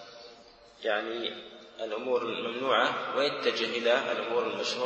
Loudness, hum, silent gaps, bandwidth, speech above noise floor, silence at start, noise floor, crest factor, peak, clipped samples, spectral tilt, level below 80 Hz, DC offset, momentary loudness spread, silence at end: -30 LUFS; none; none; 8.6 kHz; 24 dB; 0 s; -54 dBFS; 20 dB; -12 dBFS; under 0.1%; -3 dB/octave; -76 dBFS; under 0.1%; 17 LU; 0 s